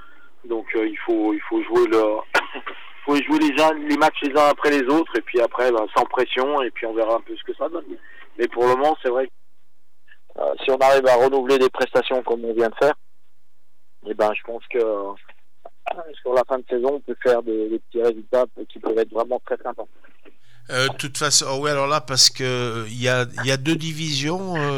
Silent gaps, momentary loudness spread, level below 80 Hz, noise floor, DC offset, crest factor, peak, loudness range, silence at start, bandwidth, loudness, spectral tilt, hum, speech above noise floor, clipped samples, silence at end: none; 14 LU; -64 dBFS; -72 dBFS; 2%; 18 dB; -4 dBFS; 6 LU; 0.45 s; 18 kHz; -21 LUFS; -3.5 dB/octave; none; 51 dB; under 0.1%; 0 s